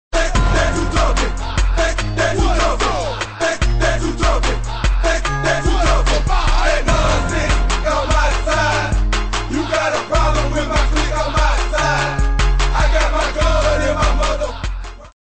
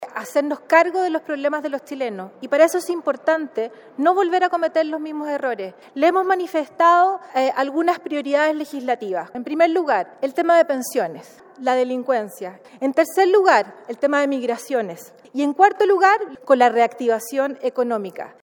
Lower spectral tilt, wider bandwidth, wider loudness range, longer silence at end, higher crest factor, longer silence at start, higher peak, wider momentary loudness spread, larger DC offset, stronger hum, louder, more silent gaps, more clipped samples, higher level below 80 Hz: about the same, -4.5 dB/octave vs -3.5 dB/octave; second, 8.8 kHz vs 17.5 kHz; about the same, 1 LU vs 3 LU; first, 0.3 s vs 0.15 s; second, 12 dB vs 18 dB; about the same, 0.1 s vs 0 s; about the same, -4 dBFS vs -2 dBFS; second, 4 LU vs 12 LU; neither; neither; first, -17 LUFS vs -20 LUFS; neither; neither; first, -18 dBFS vs -78 dBFS